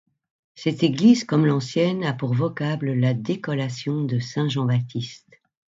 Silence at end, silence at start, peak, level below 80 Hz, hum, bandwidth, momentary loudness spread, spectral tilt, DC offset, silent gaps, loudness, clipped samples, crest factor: 0.6 s; 0.55 s; -4 dBFS; -64 dBFS; none; 7.8 kHz; 9 LU; -7 dB/octave; under 0.1%; none; -23 LUFS; under 0.1%; 18 dB